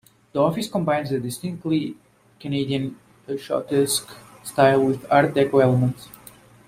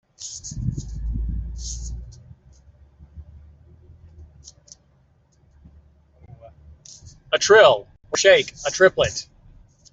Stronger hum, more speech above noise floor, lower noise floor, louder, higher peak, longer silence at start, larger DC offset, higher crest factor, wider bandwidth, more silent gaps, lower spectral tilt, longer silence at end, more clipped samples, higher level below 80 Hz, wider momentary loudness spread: neither; second, 27 dB vs 42 dB; second, -48 dBFS vs -59 dBFS; about the same, -22 LUFS vs -20 LUFS; about the same, -2 dBFS vs -2 dBFS; first, 0.35 s vs 0.2 s; neither; about the same, 20 dB vs 20 dB; first, 16 kHz vs 8.2 kHz; neither; first, -5.5 dB/octave vs -3 dB/octave; about the same, 0.6 s vs 0.7 s; neither; second, -58 dBFS vs -38 dBFS; second, 15 LU vs 21 LU